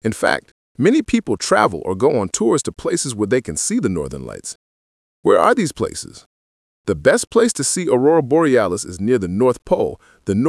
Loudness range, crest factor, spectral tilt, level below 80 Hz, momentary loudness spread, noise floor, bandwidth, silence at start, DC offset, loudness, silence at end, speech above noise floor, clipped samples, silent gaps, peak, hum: 4 LU; 18 dB; -4.5 dB/octave; -48 dBFS; 13 LU; under -90 dBFS; 12 kHz; 0.05 s; under 0.1%; -17 LUFS; 0 s; over 73 dB; under 0.1%; 0.51-0.75 s, 4.55-5.23 s, 6.26-6.84 s; 0 dBFS; none